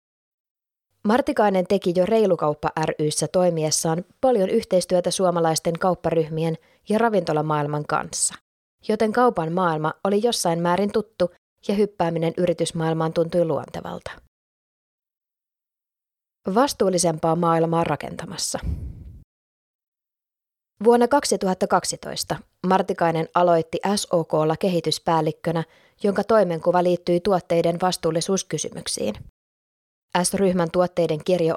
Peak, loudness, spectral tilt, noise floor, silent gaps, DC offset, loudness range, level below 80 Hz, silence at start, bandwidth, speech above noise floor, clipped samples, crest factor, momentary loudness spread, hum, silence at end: -4 dBFS; -22 LUFS; -5 dB/octave; -89 dBFS; 8.41-8.78 s, 11.38-11.56 s, 14.28-14.98 s, 15.17-15.21 s, 19.24-19.79 s, 19.88-19.92 s, 29.29-30.08 s; under 0.1%; 5 LU; -50 dBFS; 1.05 s; 16 kHz; 68 dB; under 0.1%; 18 dB; 8 LU; none; 0 s